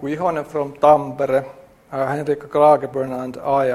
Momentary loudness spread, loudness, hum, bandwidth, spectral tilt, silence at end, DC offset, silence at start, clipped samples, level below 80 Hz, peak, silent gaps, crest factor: 11 LU; -19 LUFS; none; 13.5 kHz; -7 dB/octave; 0 s; under 0.1%; 0 s; under 0.1%; -56 dBFS; 0 dBFS; none; 18 dB